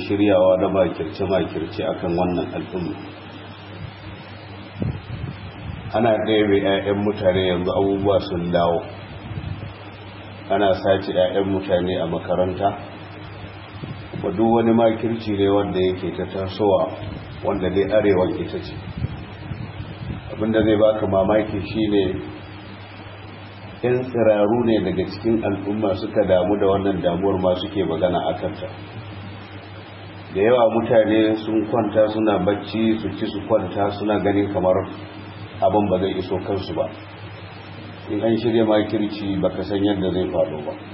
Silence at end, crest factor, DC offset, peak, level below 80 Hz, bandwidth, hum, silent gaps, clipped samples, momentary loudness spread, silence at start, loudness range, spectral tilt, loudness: 0 s; 18 dB; under 0.1%; -4 dBFS; -46 dBFS; 5.8 kHz; none; none; under 0.1%; 19 LU; 0 s; 5 LU; -11.5 dB/octave; -21 LUFS